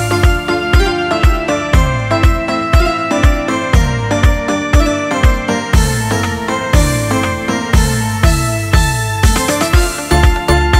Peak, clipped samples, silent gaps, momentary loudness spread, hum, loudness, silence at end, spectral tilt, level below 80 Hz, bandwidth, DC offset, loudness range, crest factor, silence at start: 0 dBFS; under 0.1%; none; 3 LU; none; -13 LUFS; 0 s; -5 dB/octave; -16 dBFS; 16.5 kHz; under 0.1%; 1 LU; 12 dB; 0 s